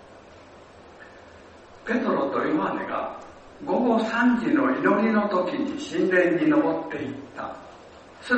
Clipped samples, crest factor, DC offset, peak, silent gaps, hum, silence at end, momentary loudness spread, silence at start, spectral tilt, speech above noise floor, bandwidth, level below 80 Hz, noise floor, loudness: under 0.1%; 18 dB; under 0.1%; -8 dBFS; none; none; 0 s; 16 LU; 0.1 s; -6.5 dB/octave; 25 dB; 8.4 kHz; -62 dBFS; -48 dBFS; -24 LUFS